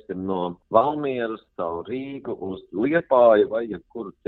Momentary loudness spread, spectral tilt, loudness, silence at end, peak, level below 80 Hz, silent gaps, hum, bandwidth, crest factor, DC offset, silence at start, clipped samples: 16 LU; -9.5 dB/octave; -23 LUFS; 0.15 s; -4 dBFS; -60 dBFS; none; none; 4.2 kHz; 20 dB; under 0.1%; 0.1 s; under 0.1%